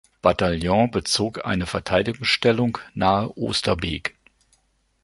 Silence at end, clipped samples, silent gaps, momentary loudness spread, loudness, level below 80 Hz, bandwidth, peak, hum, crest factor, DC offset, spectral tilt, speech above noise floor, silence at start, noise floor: 0.95 s; under 0.1%; none; 6 LU; -22 LUFS; -42 dBFS; 11.5 kHz; -2 dBFS; none; 20 dB; under 0.1%; -4.5 dB/octave; 43 dB; 0.25 s; -65 dBFS